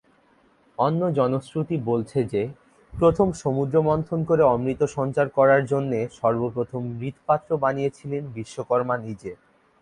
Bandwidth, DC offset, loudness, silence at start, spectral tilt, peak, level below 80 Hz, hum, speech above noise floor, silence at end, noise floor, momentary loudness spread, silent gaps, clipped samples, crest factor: 11 kHz; under 0.1%; -23 LUFS; 0.8 s; -8 dB/octave; -6 dBFS; -52 dBFS; none; 37 dB; 0.45 s; -60 dBFS; 12 LU; none; under 0.1%; 18 dB